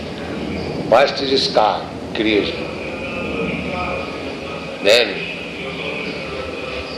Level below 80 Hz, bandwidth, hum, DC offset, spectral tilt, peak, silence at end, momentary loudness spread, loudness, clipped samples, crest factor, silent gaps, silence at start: -42 dBFS; 14.5 kHz; none; under 0.1%; -4.5 dB/octave; -2 dBFS; 0 s; 12 LU; -20 LUFS; under 0.1%; 18 dB; none; 0 s